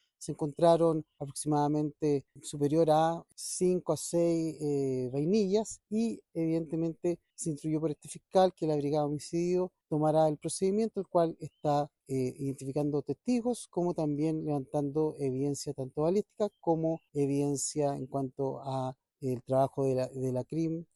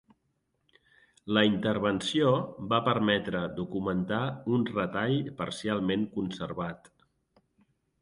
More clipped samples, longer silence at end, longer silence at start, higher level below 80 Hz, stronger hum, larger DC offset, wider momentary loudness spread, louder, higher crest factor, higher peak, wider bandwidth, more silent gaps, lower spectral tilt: neither; second, 0.1 s vs 1.25 s; second, 0.2 s vs 1.25 s; second, -66 dBFS vs -60 dBFS; neither; neither; about the same, 9 LU vs 9 LU; about the same, -31 LUFS vs -29 LUFS; about the same, 18 dB vs 22 dB; second, -12 dBFS vs -8 dBFS; about the same, 12.5 kHz vs 11.5 kHz; neither; about the same, -6.5 dB/octave vs -6 dB/octave